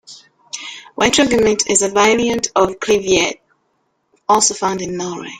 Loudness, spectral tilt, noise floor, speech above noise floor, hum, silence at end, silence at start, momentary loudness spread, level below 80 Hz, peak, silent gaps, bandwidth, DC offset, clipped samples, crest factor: -15 LUFS; -2.5 dB/octave; -66 dBFS; 50 dB; none; 0 s; 0.1 s; 16 LU; -46 dBFS; 0 dBFS; none; 16 kHz; under 0.1%; under 0.1%; 16 dB